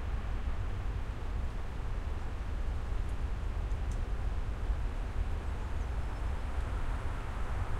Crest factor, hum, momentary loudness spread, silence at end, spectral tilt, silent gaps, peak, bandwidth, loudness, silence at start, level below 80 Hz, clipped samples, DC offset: 12 dB; none; 2 LU; 0 s; -6.5 dB/octave; none; -22 dBFS; 10.5 kHz; -39 LUFS; 0 s; -36 dBFS; under 0.1%; under 0.1%